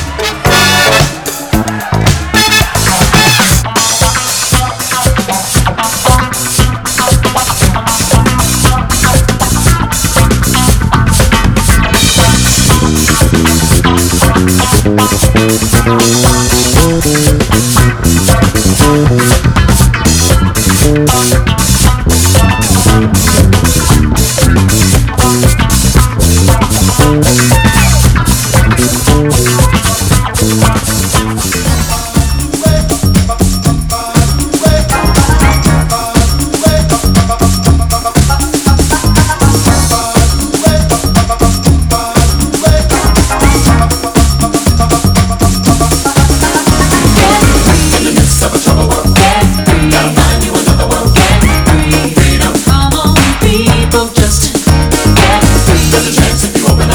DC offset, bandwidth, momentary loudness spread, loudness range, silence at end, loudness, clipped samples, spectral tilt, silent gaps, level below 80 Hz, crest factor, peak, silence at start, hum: under 0.1%; over 20 kHz; 4 LU; 2 LU; 0 s; -8 LUFS; 2%; -4 dB/octave; none; -14 dBFS; 8 dB; 0 dBFS; 0 s; none